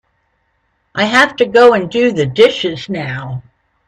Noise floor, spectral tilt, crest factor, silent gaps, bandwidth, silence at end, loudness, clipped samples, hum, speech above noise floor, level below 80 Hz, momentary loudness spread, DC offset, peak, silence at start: -63 dBFS; -5 dB/octave; 14 dB; none; 11.5 kHz; 0.45 s; -12 LUFS; under 0.1%; none; 51 dB; -52 dBFS; 16 LU; under 0.1%; 0 dBFS; 0.95 s